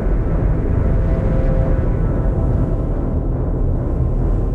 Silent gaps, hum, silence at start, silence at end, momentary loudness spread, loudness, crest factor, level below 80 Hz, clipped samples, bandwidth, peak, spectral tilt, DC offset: none; none; 0 s; 0 s; 3 LU; -19 LUFS; 10 dB; -18 dBFS; under 0.1%; 3 kHz; -6 dBFS; -11 dB/octave; under 0.1%